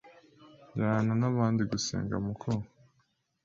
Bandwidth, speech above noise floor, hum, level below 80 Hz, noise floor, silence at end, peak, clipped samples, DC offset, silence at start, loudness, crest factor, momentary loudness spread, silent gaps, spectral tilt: 7.8 kHz; 44 dB; none; -58 dBFS; -74 dBFS; 0.8 s; -14 dBFS; under 0.1%; under 0.1%; 0.05 s; -31 LUFS; 18 dB; 8 LU; none; -6 dB/octave